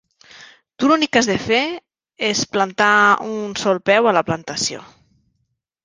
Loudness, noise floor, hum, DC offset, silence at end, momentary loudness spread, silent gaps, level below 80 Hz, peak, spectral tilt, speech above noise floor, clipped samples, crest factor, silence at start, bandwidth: -17 LUFS; -71 dBFS; none; under 0.1%; 1 s; 10 LU; none; -56 dBFS; -2 dBFS; -3 dB/octave; 54 dB; under 0.1%; 18 dB; 0.35 s; 10 kHz